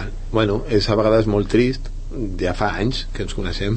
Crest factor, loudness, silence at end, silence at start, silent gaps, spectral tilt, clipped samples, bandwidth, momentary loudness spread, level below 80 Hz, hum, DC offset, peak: 16 dB; -20 LUFS; 0 s; 0 s; none; -6.5 dB/octave; under 0.1%; 8.8 kHz; 12 LU; -28 dBFS; none; under 0.1%; -4 dBFS